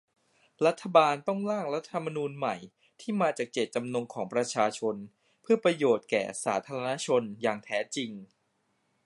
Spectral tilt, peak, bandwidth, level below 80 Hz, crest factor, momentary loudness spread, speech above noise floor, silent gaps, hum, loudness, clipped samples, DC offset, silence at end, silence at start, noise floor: -4.5 dB/octave; -8 dBFS; 11.5 kHz; -80 dBFS; 22 dB; 10 LU; 46 dB; none; none; -29 LUFS; under 0.1%; under 0.1%; 0.8 s; 0.6 s; -75 dBFS